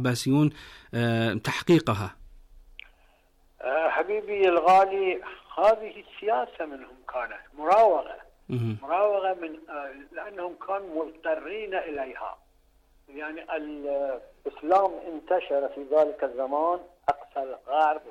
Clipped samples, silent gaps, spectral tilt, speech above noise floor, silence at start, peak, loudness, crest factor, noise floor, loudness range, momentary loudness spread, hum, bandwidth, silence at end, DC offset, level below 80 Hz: under 0.1%; none; -6.5 dB/octave; 35 dB; 0 s; -12 dBFS; -26 LUFS; 16 dB; -62 dBFS; 9 LU; 15 LU; none; 14.5 kHz; 0 s; under 0.1%; -58 dBFS